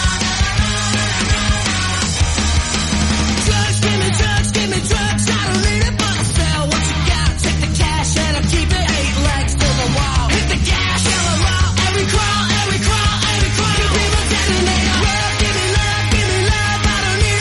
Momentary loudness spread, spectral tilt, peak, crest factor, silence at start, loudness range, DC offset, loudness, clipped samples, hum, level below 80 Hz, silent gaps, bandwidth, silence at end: 2 LU; -3.5 dB/octave; -2 dBFS; 14 dB; 0 s; 1 LU; under 0.1%; -15 LUFS; under 0.1%; none; -22 dBFS; none; 11.5 kHz; 0 s